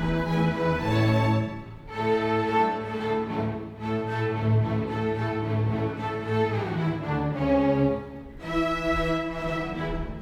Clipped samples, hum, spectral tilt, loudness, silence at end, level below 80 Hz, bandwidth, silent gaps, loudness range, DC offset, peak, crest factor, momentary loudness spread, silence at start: under 0.1%; none; -8 dB/octave; -26 LUFS; 0 s; -42 dBFS; 9.4 kHz; none; 2 LU; under 0.1%; -12 dBFS; 14 dB; 8 LU; 0 s